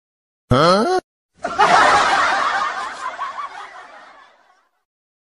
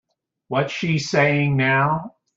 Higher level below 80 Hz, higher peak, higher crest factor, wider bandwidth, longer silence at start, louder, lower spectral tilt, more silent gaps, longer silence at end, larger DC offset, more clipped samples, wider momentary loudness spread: first, -46 dBFS vs -56 dBFS; about the same, -2 dBFS vs -4 dBFS; about the same, 18 dB vs 16 dB; first, 12 kHz vs 7.8 kHz; about the same, 0.5 s vs 0.5 s; first, -16 LUFS vs -20 LUFS; second, -4 dB/octave vs -6 dB/octave; first, 1.04-1.29 s vs none; first, 1.3 s vs 0.3 s; neither; neither; first, 18 LU vs 7 LU